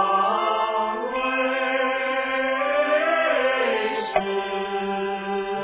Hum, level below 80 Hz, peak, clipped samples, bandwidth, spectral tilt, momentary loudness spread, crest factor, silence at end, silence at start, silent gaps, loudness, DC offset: none; -60 dBFS; -6 dBFS; under 0.1%; 4 kHz; -7.5 dB/octave; 6 LU; 16 dB; 0 s; 0 s; none; -23 LUFS; under 0.1%